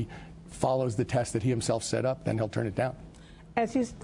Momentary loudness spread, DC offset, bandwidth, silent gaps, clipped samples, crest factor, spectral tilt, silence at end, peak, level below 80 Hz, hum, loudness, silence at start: 14 LU; under 0.1%; 11 kHz; none; under 0.1%; 18 dB; -6 dB/octave; 0 s; -12 dBFS; -54 dBFS; none; -30 LUFS; 0 s